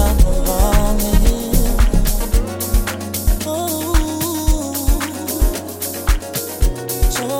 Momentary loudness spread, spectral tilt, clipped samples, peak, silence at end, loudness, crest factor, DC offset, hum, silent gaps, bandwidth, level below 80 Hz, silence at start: 5 LU; -4.5 dB/octave; under 0.1%; -2 dBFS; 0 s; -19 LUFS; 14 dB; under 0.1%; none; none; 17 kHz; -16 dBFS; 0 s